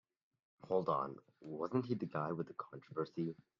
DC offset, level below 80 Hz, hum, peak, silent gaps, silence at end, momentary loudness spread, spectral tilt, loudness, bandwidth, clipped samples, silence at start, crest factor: under 0.1%; -82 dBFS; none; -22 dBFS; none; 0.25 s; 11 LU; -7.5 dB/octave; -41 LUFS; 7 kHz; under 0.1%; 0.65 s; 20 dB